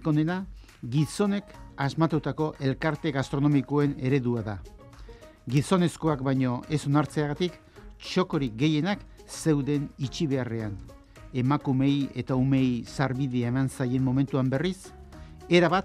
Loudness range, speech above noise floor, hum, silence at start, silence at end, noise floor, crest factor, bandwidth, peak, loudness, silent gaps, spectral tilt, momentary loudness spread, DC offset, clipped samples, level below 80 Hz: 2 LU; 21 dB; none; 0 s; 0 s; -47 dBFS; 20 dB; 13 kHz; -6 dBFS; -27 LUFS; none; -7 dB/octave; 12 LU; under 0.1%; under 0.1%; -50 dBFS